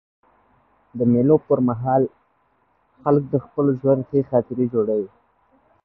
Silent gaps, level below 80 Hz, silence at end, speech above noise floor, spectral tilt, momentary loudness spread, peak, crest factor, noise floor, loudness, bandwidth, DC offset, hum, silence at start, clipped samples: none; -58 dBFS; 0.8 s; 45 dB; -14 dB/octave; 9 LU; -4 dBFS; 18 dB; -64 dBFS; -20 LUFS; 2.8 kHz; under 0.1%; none; 0.95 s; under 0.1%